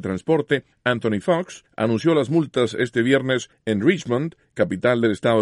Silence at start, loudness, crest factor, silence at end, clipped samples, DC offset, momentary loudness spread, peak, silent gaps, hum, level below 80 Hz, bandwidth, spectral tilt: 0 s; -21 LUFS; 16 dB; 0 s; under 0.1%; under 0.1%; 6 LU; -4 dBFS; none; none; -60 dBFS; 11.5 kHz; -6 dB/octave